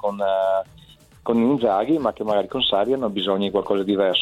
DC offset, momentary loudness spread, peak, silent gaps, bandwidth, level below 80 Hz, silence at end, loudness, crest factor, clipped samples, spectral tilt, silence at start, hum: under 0.1%; 4 LU; -6 dBFS; none; 13 kHz; -54 dBFS; 0 s; -21 LUFS; 16 dB; under 0.1%; -6.5 dB/octave; 0.05 s; none